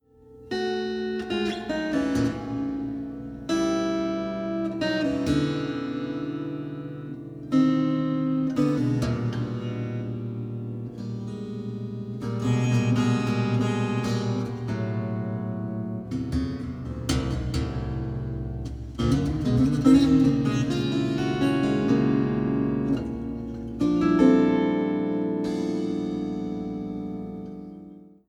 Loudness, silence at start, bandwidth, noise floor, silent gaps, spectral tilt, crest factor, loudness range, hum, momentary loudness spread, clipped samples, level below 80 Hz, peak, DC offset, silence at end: -26 LUFS; 0.3 s; 11.5 kHz; -49 dBFS; none; -7 dB/octave; 18 dB; 7 LU; none; 12 LU; under 0.1%; -44 dBFS; -8 dBFS; under 0.1%; 0.2 s